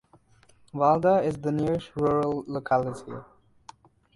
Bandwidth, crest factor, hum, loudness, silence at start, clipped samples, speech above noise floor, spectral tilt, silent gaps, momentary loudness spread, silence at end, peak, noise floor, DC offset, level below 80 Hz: 11.5 kHz; 18 dB; none; -25 LUFS; 0.75 s; under 0.1%; 34 dB; -8 dB/octave; none; 18 LU; 0.9 s; -8 dBFS; -59 dBFS; under 0.1%; -56 dBFS